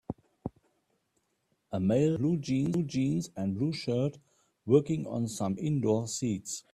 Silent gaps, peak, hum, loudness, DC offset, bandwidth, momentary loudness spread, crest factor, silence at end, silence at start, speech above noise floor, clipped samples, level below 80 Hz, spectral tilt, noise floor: none; -10 dBFS; none; -30 LUFS; under 0.1%; 14 kHz; 14 LU; 20 dB; 0.15 s; 0.1 s; 47 dB; under 0.1%; -64 dBFS; -6.5 dB/octave; -77 dBFS